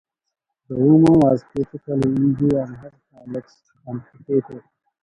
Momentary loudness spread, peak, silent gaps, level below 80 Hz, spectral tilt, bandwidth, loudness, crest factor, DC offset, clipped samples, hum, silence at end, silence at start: 20 LU; -4 dBFS; none; -50 dBFS; -10 dB/octave; 10.5 kHz; -18 LUFS; 16 dB; under 0.1%; under 0.1%; none; 0.45 s; 0.7 s